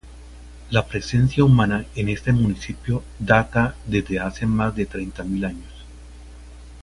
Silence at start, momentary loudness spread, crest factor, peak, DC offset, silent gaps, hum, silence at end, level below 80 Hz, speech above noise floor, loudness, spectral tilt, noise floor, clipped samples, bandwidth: 0.05 s; 11 LU; 22 dB; 0 dBFS; under 0.1%; none; 60 Hz at -35 dBFS; 0 s; -38 dBFS; 20 dB; -22 LUFS; -7 dB/octave; -41 dBFS; under 0.1%; 11.5 kHz